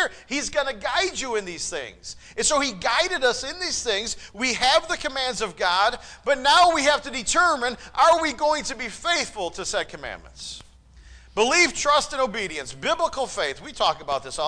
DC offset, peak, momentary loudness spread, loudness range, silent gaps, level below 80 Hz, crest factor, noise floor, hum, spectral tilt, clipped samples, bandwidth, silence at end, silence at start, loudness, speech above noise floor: under 0.1%; -8 dBFS; 13 LU; 4 LU; none; -48 dBFS; 16 dB; -49 dBFS; none; -1 dB/octave; under 0.1%; 10.5 kHz; 0 s; 0 s; -22 LUFS; 25 dB